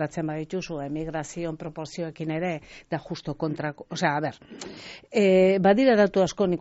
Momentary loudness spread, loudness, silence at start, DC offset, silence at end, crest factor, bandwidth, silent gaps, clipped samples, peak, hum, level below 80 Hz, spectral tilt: 17 LU; -25 LUFS; 0 s; under 0.1%; 0 s; 18 dB; 8 kHz; none; under 0.1%; -8 dBFS; none; -56 dBFS; -5.5 dB/octave